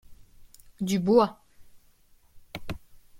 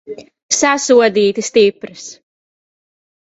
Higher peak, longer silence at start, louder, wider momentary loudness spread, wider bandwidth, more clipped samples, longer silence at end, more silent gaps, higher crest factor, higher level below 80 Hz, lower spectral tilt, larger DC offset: second, -8 dBFS vs 0 dBFS; about the same, 0.1 s vs 0.1 s; second, -26 LUFS vs -13 LUFS; about the same, 21 LU vs 22 LU; first, 16.5 kHz vs 8.2 kHz; neither; second, 0 s vs 1.15 s; second, none vs 0.43-0.49 s; about the same, 20 dB vs 16 dB; first, -54 dBFS vs -60 dBFS; first, -6.5 dB/octave vs -2.5 dB/octave; neither